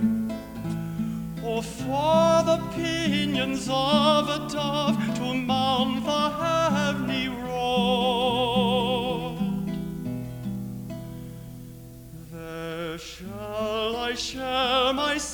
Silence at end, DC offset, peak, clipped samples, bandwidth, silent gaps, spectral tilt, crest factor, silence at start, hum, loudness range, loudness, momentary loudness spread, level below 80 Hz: 0 s; under 0.1%; -8 dBFS; under 0.1%; over 20 kHz; none; -5 dB/octave; 18 dB; 0 s; none; 11 LU; -25 LUFS; 15 LU; -48 dBFS